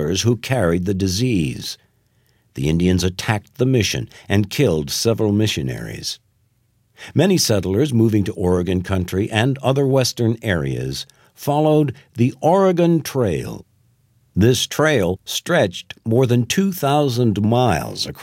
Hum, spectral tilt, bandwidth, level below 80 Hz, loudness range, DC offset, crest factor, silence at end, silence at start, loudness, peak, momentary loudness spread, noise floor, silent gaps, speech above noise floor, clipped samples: none; -5.5 dB/octave; 16.5 kHz; -44 dBFS; 3 LU; under 0.1%; 18 dB; 0 s; 0 s; -19 LUFS; 0 dBFS; 10 LU; -62 dBFS; none; 44 dB; under 0.1%